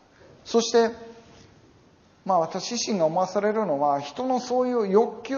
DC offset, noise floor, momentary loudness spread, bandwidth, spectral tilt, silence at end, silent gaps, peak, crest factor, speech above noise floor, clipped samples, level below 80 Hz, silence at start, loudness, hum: under 0.1%; -57 dBFS; 6 LU; 7.2 kHz; -4 dB/octave; 0 s; none; -6 dBFS; 20 dB; 33 dB; under 0.1%; -68 dBFS; 0.45 s; -24 LUFS; none